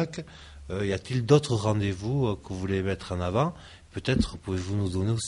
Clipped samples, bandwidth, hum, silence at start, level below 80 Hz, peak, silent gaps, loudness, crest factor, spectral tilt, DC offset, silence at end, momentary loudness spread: under 0.1%; 11.5 kHz; none; 0 s; -46 dBFS; -6 dBFS; none; -28 LUFS; 22 dB; -6.5 dB/octave; under 0.1%; 0 s; 15 LU